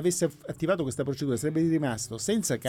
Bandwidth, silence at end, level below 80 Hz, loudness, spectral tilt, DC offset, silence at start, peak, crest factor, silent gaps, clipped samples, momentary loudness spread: 17 kHz; 0 s; -58 dBFS; -28 LUFS; -5 dB/octave; under 0.1%; 0 s; -14 dBFS; 14 dB; none; under 0.1%; 5 LU